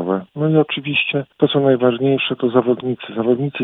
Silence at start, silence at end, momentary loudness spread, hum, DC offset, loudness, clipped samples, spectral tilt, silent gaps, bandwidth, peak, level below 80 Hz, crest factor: 0 s; 0 s; 6 LU; none; under 0.1%; -17 LUFS; under 0.1%; -9.5 dB/octave; none; 4 kHz; 0 dBFS; -62 dBFS; 16 dB